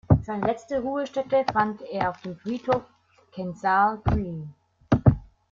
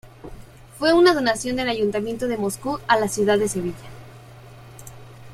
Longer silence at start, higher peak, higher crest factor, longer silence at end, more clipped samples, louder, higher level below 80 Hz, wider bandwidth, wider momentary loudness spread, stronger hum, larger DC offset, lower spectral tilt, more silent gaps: about the same, 0.1 s vs 0.05 s; about the same, -2 dBFS vs -2 dBFS; about the same, 22 dB vs 20 dB; first, 0.3 s vs 0 s; neither; second, -26 LUFS vs -21 LUFS; first, -40 dBFS vs -48 dBFS; second, 7.4 kHz vs 15.5 kHz; second, 14 LU vs 26 LU; neither; neither; first, -8.5 dB/octave vs -4 dB/octave; neither